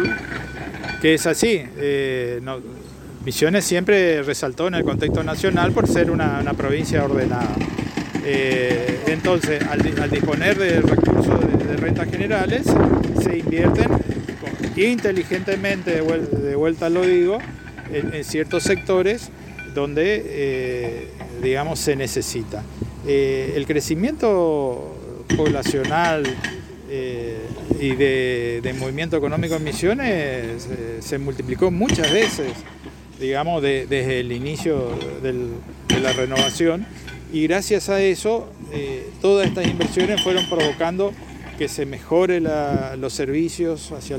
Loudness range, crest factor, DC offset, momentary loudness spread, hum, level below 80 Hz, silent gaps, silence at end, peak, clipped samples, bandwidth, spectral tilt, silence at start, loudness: 5 LU; 18 dB; under 0.1%; 12 LU; none; -40 dBFS; none; 0 s; -4 dBFS; under 0.1%; 17 kHz; -5 dB/octave; 0 s; -21 LUFS